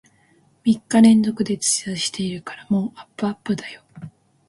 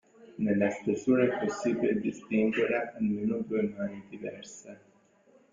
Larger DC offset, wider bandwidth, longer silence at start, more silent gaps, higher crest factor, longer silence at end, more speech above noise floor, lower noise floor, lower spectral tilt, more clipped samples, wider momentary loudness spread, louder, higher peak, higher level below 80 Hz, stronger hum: neither; first, 11.5 kHz vs 7.6 kHz; first, 0.65 s vs 0.2 s; neither; about the same, 18 dB vs 18 dB; second, 0.4 s vs 0.75 s; first, 38 dB vs 33 dB; second, -58 dBFS vs -63 dBFS; second, -4.5 dB/octave vs -6.5 dB/octave; neither; first, 20 LU vs 15 LU; first, -20 LUFS vs -30 LUFS; first, -2 dBFS vs -12 dBFS; first, -60 dBFS vs -68 dBFS; neither